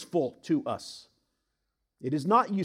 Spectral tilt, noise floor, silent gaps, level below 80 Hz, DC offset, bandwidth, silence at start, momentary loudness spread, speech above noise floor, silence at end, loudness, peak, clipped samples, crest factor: -6.5 dB/octave; -81 dBFS; none; -78 dBFS; under 0.1%; 14.5 kHz; 0 s; 17 LU; 53 dB; 0 s; -29 LUFS; -10 dBFS; under 0.1%; 20 dB